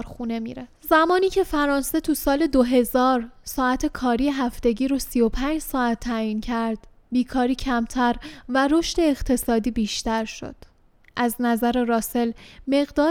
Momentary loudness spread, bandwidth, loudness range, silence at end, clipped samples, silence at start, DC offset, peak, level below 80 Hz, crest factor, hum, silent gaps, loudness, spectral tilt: 10 LU; 18.5 kHz; 3 LU; 0 s; under 0.1%; 0 s; under 0.1%; -4 dBFS; -40 dBFS; 18 dB; none; none; -23 LUFS; -4 dB/octave